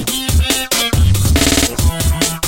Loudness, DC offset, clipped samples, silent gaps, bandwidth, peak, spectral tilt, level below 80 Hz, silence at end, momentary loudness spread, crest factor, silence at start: -14 LUFS; under 0.1%; under 0.1%; none; 17 kHz; 0 dBFS; -3.5 dB/octave; -18 dBFS; 0 s; 4 LU; 14 dB; 0 s